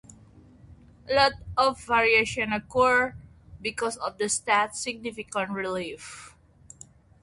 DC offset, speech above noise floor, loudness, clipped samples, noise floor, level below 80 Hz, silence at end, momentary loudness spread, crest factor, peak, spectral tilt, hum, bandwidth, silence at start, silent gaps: under 0.1%; 27 dB; -25 LUFS; under 0.1%; -53 dBFS; -54 dBFS; 0.95 s; 13 LU; 20 dB; -8 dBFS; -2.5 dB/octave; none; 11.5 kHz; 0.35 s; none